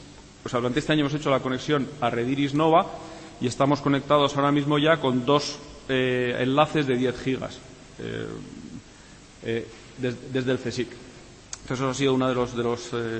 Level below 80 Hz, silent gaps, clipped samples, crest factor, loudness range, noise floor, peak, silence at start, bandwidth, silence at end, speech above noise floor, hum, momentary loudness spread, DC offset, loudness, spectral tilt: -54 dBFS; none; under 0.1%; 20 dB; 9 LU; -48 dBFS; -6 dBFS; 0 s; 8.8 kHz; 0 s; 24 dB; none; 18 LU; under 0.1%; -25 LUFS; -5.5 dB/octave